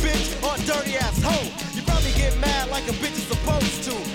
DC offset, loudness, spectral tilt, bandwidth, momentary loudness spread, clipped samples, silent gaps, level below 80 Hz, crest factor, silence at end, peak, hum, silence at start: under 0.1%; -23 LUFS; -4 dB/octave; 17.5 kHz; 4 LU; under 0.1%; none; -28 dBFS; 14 dB; 0 s; -10 dBFS; none; 0 s